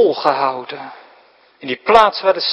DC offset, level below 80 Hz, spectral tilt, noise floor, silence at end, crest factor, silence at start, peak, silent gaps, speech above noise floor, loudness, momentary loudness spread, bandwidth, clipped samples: under 0.1%; -52 dBFS; -4 dB/octave; -50 dBFS; 0 s; 16 dB; 0 s; 0 dBFS; none; 35 dB; -15 LUFS; 20 LU; 11 kHz; 0.2%